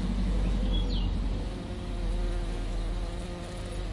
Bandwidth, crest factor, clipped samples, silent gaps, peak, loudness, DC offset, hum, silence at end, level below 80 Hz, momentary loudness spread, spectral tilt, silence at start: 11.5 kHz; 12 dB; under 0.1%; none; -18 dBFS; -34 LUFS; under 0.1%; none; 0 s; -30 dBFS; 7 LU; -6.5 dB/octave; 0 s